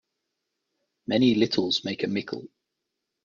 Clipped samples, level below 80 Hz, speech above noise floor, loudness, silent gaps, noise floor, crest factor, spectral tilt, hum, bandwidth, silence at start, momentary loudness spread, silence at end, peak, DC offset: under 0.1%; -66 dBFS; 58 dB; -25 LUFS; none; -83 dBFS; 20 dB; -5.5 dB/octave; none; 7.4 kHz; 1.1 s; 16 LU; 0.8 s; -8 dBFS; under 0.1%